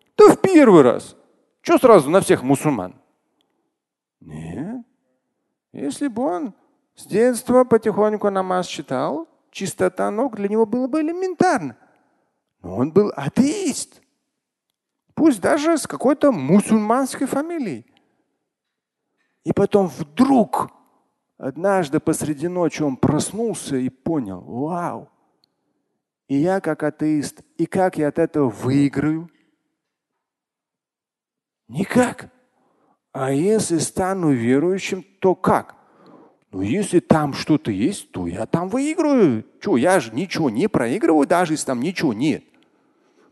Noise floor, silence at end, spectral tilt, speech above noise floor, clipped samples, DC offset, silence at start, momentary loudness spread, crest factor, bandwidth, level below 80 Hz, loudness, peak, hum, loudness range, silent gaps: -89 dBFS; 0.9 s; -6 dB/octave; 70 dB; under 0.1%; under 0.1%; 0.2 s; 13 LU; 20 dB; 12.5 kHz; -54 dBFS; -19 LUFS; 0 dBFS; none; 7 LU; none